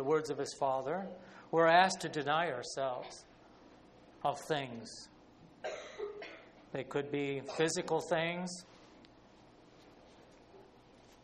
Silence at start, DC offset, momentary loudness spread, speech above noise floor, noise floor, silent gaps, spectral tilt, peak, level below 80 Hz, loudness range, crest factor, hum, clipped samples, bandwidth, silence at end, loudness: 0 s; under 0.1%; 19 LU; 26 dB; -61 dBFS; none; -4 dB/octave; -12 dBFS; -72 dBFS; 10 LU; 24 dB; none; under 0.1%; 10.5 kHz; 0.6 s; -35 LUFS